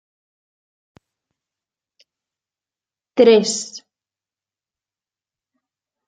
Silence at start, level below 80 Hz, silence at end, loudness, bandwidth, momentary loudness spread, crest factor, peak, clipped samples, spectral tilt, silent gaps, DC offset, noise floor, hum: 3.15 s; -72 dBFS; 2.3 s; -16 LUFS; 9.4 kHz; 21 LU; 24 dB; 0 dBFS; under 0.1%; -3.5 dB/octave; none; under 0.1%; under -90 dBFS; none